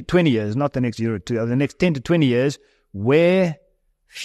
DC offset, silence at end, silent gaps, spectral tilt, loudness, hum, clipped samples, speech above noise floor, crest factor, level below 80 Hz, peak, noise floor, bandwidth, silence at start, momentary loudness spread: under 0.1%; 0 s; none; -7 dB/octave; -20 LUFS; none; under 0.1%; 43 dB; 16 dB; -48 dBFS; -4 dBFS; -62 dBFS; 12.5 kHz; 0 s; 14 LU